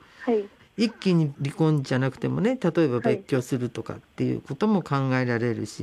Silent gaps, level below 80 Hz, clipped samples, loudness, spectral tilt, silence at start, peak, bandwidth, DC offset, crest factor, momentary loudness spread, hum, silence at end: none; -62 dBFS; under 0.1%; -25 LUFS; -7.5 dB/octave; 0.2 s; -10 dBFS; 13 kHz; under 0.1%; 14 dB; 6 LU; none; 0 s